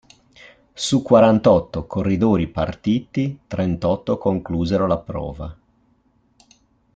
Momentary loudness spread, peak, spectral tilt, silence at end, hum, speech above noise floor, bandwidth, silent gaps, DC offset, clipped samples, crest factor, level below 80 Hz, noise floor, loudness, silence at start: 13 LU; -2 dBFS; -6.5 dB/octave; 1.45 s; none; 42 dB; 9.2 kHz; none; under 0.1%; under 0.1%; 18 dB; -44 dBFS; -61 dBFS; -20 LUFS; 0.75 s